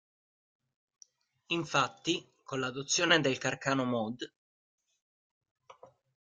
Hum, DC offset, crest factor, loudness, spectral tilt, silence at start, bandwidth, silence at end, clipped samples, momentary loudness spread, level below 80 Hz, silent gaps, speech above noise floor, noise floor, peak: none; under 0.1%; 26 dB; -31 LUFS; -3 dB/octave; 1.5 s; 10 kHz; 0.35 s; under 0.1%; 13 LU; -74 dBFS; 4.36-4.78 s, 5.02-5.41 s, 5.51-5.56 s; 27 dB; -58 dBFS; -10 dBFS